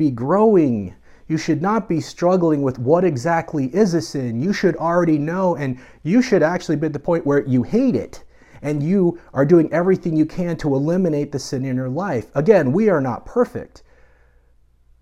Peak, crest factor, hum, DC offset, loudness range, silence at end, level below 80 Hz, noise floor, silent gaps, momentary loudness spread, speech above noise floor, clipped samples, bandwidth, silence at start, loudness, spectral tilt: -2 dBFS; 18 dB; none; under 0.1%; 1 LU; 1.35 s; -50 dBFS; -55 dBFS; none; 10 LU; 36 dB; under 0.1%; 12.5 kHz; 0 s; -19 LUFS; -7.5 dB/octave